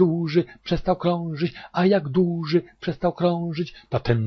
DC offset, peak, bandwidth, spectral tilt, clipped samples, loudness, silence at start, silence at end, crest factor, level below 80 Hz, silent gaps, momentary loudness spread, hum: under 0.1%; -6 dBFS; 6.2 kHz; -8.5 dB/octave; under 0.1%; -24 LUFS; 0 s; 0 s; 18 dB; -44 dBFS; none; 8 LU; none